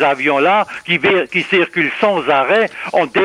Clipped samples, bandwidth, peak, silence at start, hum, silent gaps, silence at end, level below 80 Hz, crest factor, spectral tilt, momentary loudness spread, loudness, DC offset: under 0.1%; 11.5 kHz; -2 dBFS; 0 s; none; none; 0 s; -60 dBFS; 12 dB; -5.5 dB/octave; 4 LU; -14 LUFS; under 0.1%